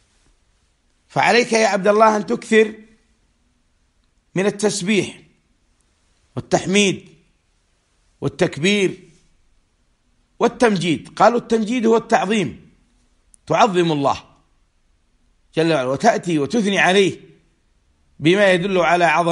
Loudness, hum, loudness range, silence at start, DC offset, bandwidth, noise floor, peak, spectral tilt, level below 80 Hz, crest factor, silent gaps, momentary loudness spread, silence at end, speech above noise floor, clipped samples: -17 LUFS; none; 6 LU; 1.15 s; under 0.1%; 11.5 kHz; -63 dBFS; 0 dBFS; -4.5 dB/octave; -56 dBFS; 20 dB; none; 12 LU; 0 s; 46 dB; under 0.1%